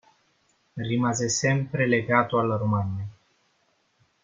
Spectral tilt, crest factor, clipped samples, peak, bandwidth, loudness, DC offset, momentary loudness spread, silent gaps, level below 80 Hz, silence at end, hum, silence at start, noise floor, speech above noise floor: -5 dB/octave; 22 dB; under 0.1%; -4 dBFS; 9.6 kHz; -25 LUFS; under 0.1%; 14 LU; none; -62 dBFS; 1.1 s; none; 0.75 s; -69 dBFS; 44 dB